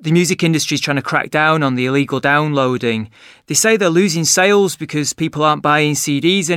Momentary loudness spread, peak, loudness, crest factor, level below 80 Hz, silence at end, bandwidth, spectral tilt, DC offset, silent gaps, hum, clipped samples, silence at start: 7 LU; 0 dBFS; -15 LUFS; 14 dB; -60 dBFS; 0 s; 16.5 kHz; -4 dB/octave; under 0.1%; none; none; under 0.1%; 0 s